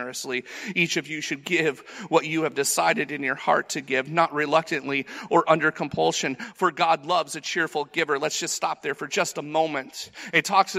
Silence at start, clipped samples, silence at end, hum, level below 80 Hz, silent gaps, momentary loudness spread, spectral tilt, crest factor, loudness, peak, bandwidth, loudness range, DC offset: 0 s; under 0.1%; 0 s; none; -70 dBFS; none; 8 LU; -3 dB/octave; 20 dB; -24 LUFS; -4 dBFS; 16 kHz; 2 LU; under 0.1%